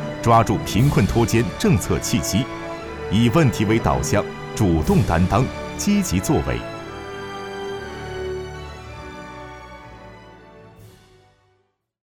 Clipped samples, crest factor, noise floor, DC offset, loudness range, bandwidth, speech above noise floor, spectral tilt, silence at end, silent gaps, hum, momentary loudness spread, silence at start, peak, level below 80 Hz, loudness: under 0.1%; 18 dB; -67 dBFS; under 0.1%; 16 LU; 19 kHz; 49 dB; -6 dB/octave; 1.2 s; none; none; 19 LU; 0 s; -2 dBFS; -36 dBFS; -20 LUFS